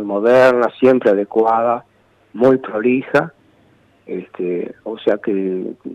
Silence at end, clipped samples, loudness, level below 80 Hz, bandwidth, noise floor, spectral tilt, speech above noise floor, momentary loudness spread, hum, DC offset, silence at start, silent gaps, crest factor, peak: 0 s; under 0.1%; -16 LUFS; -62 dBFS; 9.4 kHz; -53 dBFS; -7.5 dB/octave; 38 dB; 16 LU; none; under 0.1%; 0 s; none; 14 dB; -4 dBFS